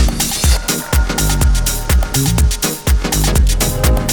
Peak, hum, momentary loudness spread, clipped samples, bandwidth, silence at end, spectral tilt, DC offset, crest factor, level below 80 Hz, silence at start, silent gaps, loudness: 0 dBFS; none; 3 LU; under 0.1%; 19.5 kHz; 0 s; -4 dB/octave; under 0.1%; 14 dB; -16 dBFS; 0 s; none; -15 LUFS